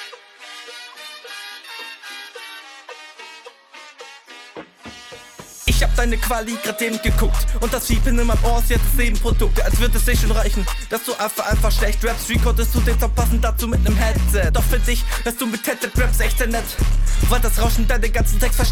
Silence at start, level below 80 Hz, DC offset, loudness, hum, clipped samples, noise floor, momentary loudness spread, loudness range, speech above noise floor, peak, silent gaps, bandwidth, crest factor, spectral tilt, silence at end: 0 s; -20 dBFS; under 0.1%; -20 LUFS; none; under 0.1%; -43 dBFS; 19 LU; 15 LU; 26 dB; -4 dBFS; none; 18 kHz; 14 dB; -4.5 dB/octave; 0 s